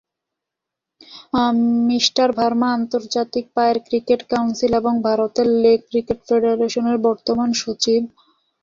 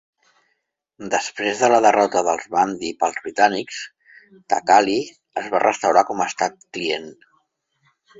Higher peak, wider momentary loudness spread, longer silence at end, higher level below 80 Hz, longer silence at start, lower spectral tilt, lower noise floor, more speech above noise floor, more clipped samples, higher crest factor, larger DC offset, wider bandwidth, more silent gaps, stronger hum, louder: about the same, -4 dBFS vs -2 dBFS; second, 6 LU vs 13 LU; second, 0.55 s vs 1.05 s; first, -54 dBFS vs -64 dBFS; about the same, 1.1 s vs 1 s; about the same, -4 dB/octave vs -3 dB/octave; first, -84 dBFS vs -73 dBFS; first, 66 dB vs 53 dB; neither; about the same, 16 dB vs 20 dB; neither; about the same, 7.6 kHz vs 8 kHz; neither; neither; about the same, -18 LUFS vs -20 LUFS